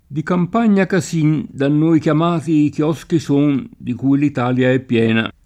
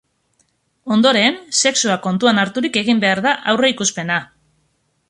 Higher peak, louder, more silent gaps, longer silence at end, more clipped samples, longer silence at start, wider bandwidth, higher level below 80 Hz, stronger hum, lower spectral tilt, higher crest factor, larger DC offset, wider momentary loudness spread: about the same, -4 dBFS vs -2 dBFS; about the same, -16 LUFS vs -16 LUFS; neither; second, 0.15 s vs 0.85 s; neither; second, 0.1 s vs 0.85 s; about the same, 11.5 kHz vs 11.5 kHz; first, -52 dBFS vs -62 dBFS; neither; first, -7 dB/octave vs -3 dB/octave; about the same, 12 dB vs 16 dB; neither; about the same, 6 LU vs 7 LU